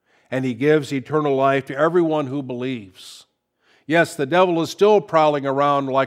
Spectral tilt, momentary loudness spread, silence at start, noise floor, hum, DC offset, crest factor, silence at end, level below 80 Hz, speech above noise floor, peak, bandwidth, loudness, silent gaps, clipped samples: -6 dB/octave; 11 LU; 0.3 s; -62 dBFS; none; under 0.1%; 18 dB; 0 s; -72 dBFS; 43 dB; -2 dBFS; 15 kHz; -19 LUFS; none; under 0.1%